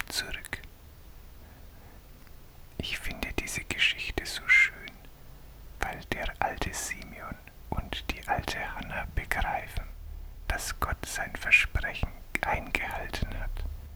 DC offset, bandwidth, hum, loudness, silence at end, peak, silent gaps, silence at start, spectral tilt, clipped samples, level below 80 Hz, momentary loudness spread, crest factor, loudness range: under 0.1%; 19 kHz; none; -30 LUFS; 0 s; -6 dBFS; none; 0 s; -3 dB/octave; under 0.1%; -40 dBFS; 20 LU; 26 dB; 8 LU